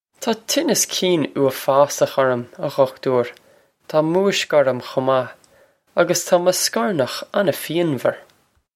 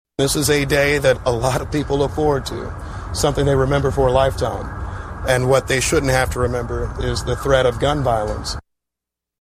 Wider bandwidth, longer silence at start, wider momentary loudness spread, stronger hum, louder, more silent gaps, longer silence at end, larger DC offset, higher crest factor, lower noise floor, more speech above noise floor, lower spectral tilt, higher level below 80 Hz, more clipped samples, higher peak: about the same, 16.5 kHz vs 15 kHz; about the same, 0.2 s vs 0.2 s; second, 7 LU vs 12 LU; neither; about the same, -19 LUFS vs -19 LUFS; neither; second, 0.55 s vs 0.85 s; neither; about the same, 18 dB vs 16 dB; second, -56 dBFS vs -85 dBFS; second, 37 dB vs 67 dB; about the same, -3.5 dB/octave vs -4.5 dB/octave; second, -68 dBFS vs -30 dBFS; neither; about the same, -2 dBFS vs -2 dBFS